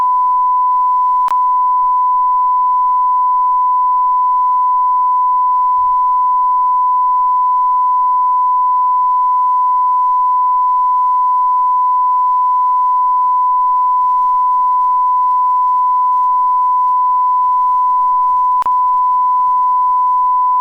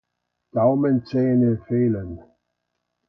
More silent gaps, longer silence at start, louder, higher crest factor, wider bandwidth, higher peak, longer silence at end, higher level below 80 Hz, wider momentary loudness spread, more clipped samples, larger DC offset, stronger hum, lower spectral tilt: neither; second, 0 s vs 0.55 s; first, -12 LUFS vs -21 LUFS; second, 4 dB vs 16 dB; second, 2.1 kHz vs 5.6 kHz; about the same, -8 dBFS vs -8 dBFS; second, 0 s vs 0.9 s; about the same, -54 dBFS vs -52 dBFS; second, 0 LU vs 11 LU; neither; neither; second, none vs 60 Hz at -35 dBFS; second, -3.5 dB/octave vs -11.5 dB/octave